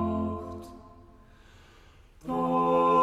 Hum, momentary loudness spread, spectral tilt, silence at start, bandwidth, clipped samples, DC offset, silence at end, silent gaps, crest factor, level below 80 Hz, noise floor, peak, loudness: none; 22 LU; -8 dB/octave; 0 s; 13.5 kHz; under 0.1%; under 0.1%; 0 s; none; 18 dB; -52 dBFS; -55 dBFS; -12 dBFS; -27 LUFS